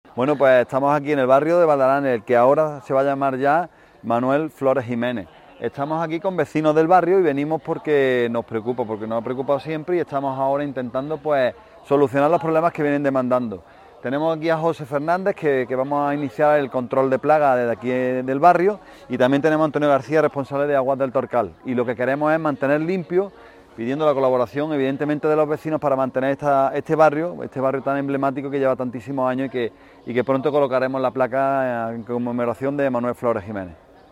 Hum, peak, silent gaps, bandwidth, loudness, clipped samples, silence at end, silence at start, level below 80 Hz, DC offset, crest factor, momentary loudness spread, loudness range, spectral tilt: none; -2 dBFS; none; 15 kHz; -20 LUFS; under 0.1%; 0.35 s; 0.15 s; -60 dBFS; under 0.1%; 18 dB; 9 LU; 4 LU; -7.5 dB/octave